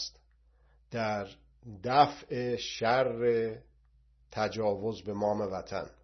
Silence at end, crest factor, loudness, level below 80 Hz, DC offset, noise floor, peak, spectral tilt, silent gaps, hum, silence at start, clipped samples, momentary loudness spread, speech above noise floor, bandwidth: 0.1 s; 24 dB; -31 LUFS; -62 dBFS; under 0.1%; -65 dBFS; -10 dBFS; -5 dB/octave; none; none; 0 s; under 0.1%; 15 LU; 34 dB; 6.4 kHz